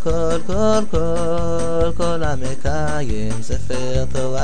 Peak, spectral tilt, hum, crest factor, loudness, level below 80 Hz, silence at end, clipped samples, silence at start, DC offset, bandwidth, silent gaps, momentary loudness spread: -4 dBFS; -6 dB/octave; none; 14 dB; -21 LUFS; -30 dBFS; 0 s; under 0.1%; 0 s; 20%; 10.5 kHz; none; 6 LU